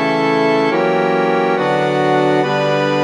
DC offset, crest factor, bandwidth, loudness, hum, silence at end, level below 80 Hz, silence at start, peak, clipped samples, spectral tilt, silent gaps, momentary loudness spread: under 0.1%; 12 dB; 11 kHz; -15 LUFS; none; 0 s; -58 dBFS; 0 s; -2 dBFS; under 0.1%; -6 dB/octave; none; 1 LU